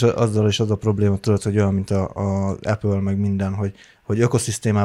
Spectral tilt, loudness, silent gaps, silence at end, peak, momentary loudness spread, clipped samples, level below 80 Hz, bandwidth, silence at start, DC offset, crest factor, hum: -6.5 dB/octave; -21 LUFS; none; 0 s; -4 dBFS; 5 LU; under 0.1%; -48 dBFS; 12.5 kHz; 0 s; under 0.1%; 16 dB; none